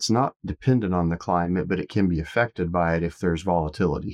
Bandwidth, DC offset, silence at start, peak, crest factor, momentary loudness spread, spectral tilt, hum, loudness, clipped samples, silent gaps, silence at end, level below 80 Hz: 11.5 kHz; under 0.1%; 0 s; -8 dBFS; 16 dB; 3 LU; -6.5 dB/octave; none; -24 LUFS; under 0.1%; 0.36-0.40 s; 0 s; -42 dBFS